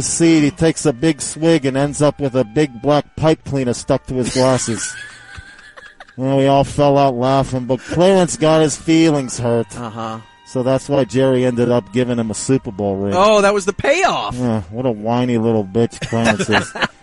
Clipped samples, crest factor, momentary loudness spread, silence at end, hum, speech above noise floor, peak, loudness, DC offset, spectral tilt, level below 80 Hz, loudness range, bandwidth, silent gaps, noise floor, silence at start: under 0.1%; 16 dB; 8 LU; 0.15 s; none; 24 dB; 0 dBFS; -16 LUFS; under 0.1%; -5 dB/octave; -42 dBFS; 3 LU; 11.5 kHz; none; -40 dBFS; 0 s